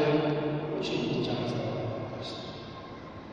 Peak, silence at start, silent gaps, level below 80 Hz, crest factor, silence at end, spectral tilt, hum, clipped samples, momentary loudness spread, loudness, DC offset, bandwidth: -14 dBFS; 0 s; none; -60 dBFS; 16 dB; 0 s; -7 dB/octave; none; under 0.1%; 14 LU; -32 LUFS; under 0.1%; 9.2 kHz